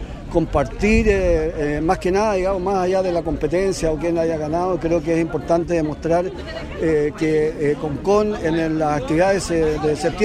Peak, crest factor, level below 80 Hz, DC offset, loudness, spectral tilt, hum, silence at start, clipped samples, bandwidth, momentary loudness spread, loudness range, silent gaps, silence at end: -4 dBFS; 16 dB; -32 dBFS; under 0.1%; -20 LUFS; -6.5 dB/octave; none; 0 s; under 0.1%; 12.5 kHz; 4 LU; 2 LU; none; 0 s